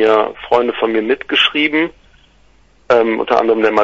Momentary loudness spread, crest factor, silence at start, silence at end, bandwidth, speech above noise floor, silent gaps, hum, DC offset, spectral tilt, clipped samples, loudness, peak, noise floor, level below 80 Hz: 5 LU; 14 dB; 0 s; 0 s; 7.8 kHz; 36 dB; none; none; under 0.1%; -4.5 dB/octave; under 0.1%; -14 LUFS; 0 dBFS; -50 dBFS; -52 dBFS